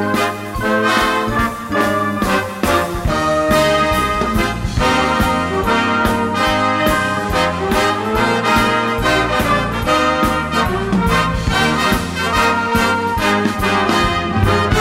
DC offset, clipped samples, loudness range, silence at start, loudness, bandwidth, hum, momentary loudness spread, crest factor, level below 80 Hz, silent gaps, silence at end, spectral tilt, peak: under 0.1%; under 0.1%; 1 LU; 0 s; -15 LUFS; 16.5 kHz; none; 3 LU; 14 dB; -28 dBFS; none; 0 s; -4.5 dB/octave; 0 dBFS